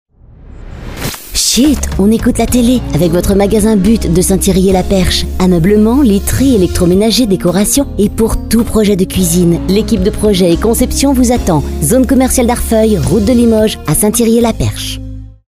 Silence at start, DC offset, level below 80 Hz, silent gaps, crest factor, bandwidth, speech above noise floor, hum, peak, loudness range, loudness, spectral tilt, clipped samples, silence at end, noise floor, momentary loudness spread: 0.55 s; under 0.1%; -22 dBFS; none; 10 dB; 16 kHz; 25 dB; none; 0 dBFS; 1 LU; -10 LUFS; -5 dB/octave; under 0.1%; 0.2 s; -35 dBFS; 5 LU